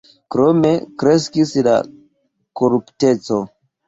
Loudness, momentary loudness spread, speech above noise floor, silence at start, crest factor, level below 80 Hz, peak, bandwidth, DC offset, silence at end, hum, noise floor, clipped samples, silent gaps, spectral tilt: -17 LUFS; 9 LU; 49 dB; 0.3 s; 14 dB; -56 dBFS; -2 dBFS; 8 kHz; under 0.1%; 0.4 s; none; -64 dBFS; under 0.1%; none; -6.5 dB/octave